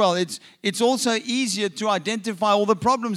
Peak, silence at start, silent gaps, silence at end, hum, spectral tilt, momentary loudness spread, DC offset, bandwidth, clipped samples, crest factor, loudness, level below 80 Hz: -6 dBFS; 0 s; none; 0 s; none; -3.5 dB/octave; 7 LU; under 0.1%; 15.5 kHz; under 0.1%; 16 dB; -22 LUFS; -66 dBFS